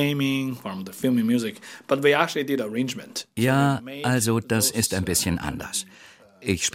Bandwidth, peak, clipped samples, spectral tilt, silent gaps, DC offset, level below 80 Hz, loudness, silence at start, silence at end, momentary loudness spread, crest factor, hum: 16.5 kHz; -4 dBFS; under 0.1%; -4 dB/octave; none; under 0.1%; -52 dBFS; -24 LUFS; 0 s; 0 s; 12 LU; 20 dB; none